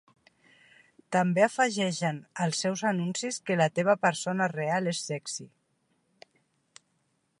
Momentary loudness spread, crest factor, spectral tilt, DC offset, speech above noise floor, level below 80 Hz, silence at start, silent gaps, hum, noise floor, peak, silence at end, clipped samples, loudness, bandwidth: 8 LU; 20 dB; -4.5 dB/octave; under 0.1%; 46 dB; -78 dBFS; 1.1 s; none; none; -74 dBFS; -10 dBFS; 1.95 s; under 0.1%; -28 LUFS; 11.5 kHz